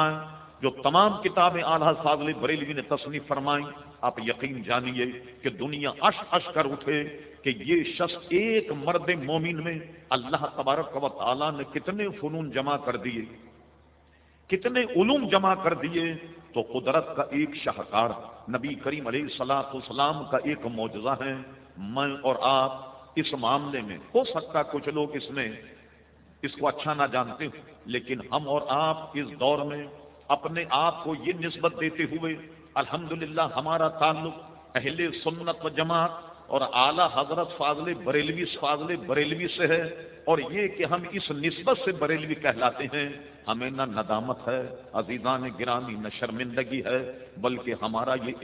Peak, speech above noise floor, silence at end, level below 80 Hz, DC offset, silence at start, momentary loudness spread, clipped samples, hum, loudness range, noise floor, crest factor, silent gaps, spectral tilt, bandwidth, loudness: -6 dBFS; 31 dB; 0 s; -62 dBFS; under 0.1%; 0 s; 10 LU; under 0.1%; none; 4 LU; -59 dBFS; 22 dB; none; -9 dB/octave; 4 kHz; -28 LUFS